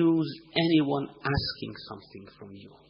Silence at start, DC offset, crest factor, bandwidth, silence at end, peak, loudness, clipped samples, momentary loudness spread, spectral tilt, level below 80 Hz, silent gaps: 0 s; under 0.1%; 20 dB; 5.6 kHz; 0.2 s; -8 dBFS; -28 LUFS; under 0.1%; 23 LU; -4.5 dB/octave; -52 dBFS; none